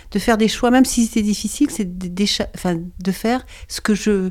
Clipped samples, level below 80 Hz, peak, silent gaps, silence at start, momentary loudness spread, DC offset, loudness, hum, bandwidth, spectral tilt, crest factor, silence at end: under 0.1%; -38 dBFS; -2 dBFS; none; 0.05 s; 10 LU; under 0.1%; -19 LUFS; none; 16 kHz; -4.5 dB/octave; 16 dB; 0 s